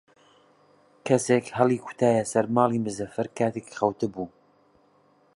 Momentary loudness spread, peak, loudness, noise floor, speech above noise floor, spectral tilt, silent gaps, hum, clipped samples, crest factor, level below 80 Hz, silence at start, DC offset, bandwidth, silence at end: 9 LU; -6 dBFS; -25 LUFS; -62 dBFS; 37 dB; -6 dB/octave; none; none; under 0.1%; 20 dB; -66 dBFS; 1.05 s; under 0.1%; 11.5 kHz; 1.1 s